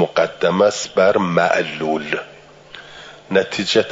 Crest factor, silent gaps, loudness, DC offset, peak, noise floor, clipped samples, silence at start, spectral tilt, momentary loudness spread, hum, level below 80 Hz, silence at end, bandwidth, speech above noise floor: 16 dB; none; -18 LUFS; under 0.1%; -2 dBFS; -40 dBFS; under 0.1%; 0 s; -4.5 dB/octave; 22 LU; none; -60 dBFS; 0 s; 7.8 kHz; 23 dB